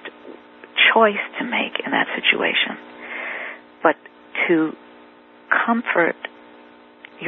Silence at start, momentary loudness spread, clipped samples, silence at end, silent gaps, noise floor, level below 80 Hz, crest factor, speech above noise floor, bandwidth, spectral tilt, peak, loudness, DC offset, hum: 0.05 s; 17 LU; under 0.1%; 0 s; none; -47 dBFS; -74 dBFS; 22 dB; 28 dB; 4.2 kHz; -8 dB/octave; 0 dBFS; -19 LUFS; under 0.1%; none